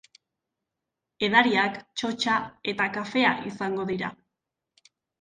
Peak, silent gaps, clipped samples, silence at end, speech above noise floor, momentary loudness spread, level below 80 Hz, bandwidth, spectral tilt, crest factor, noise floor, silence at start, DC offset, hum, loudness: -2 dBFS; none; under 0.1%; 1.05 s; 60 dB; 12 LU; -66 dBFS; 9.6 kHz; -4.5 dB/octave; 26 dB; -86 dBFS; 1.2 s; under 0.1%; none; -25 LUFS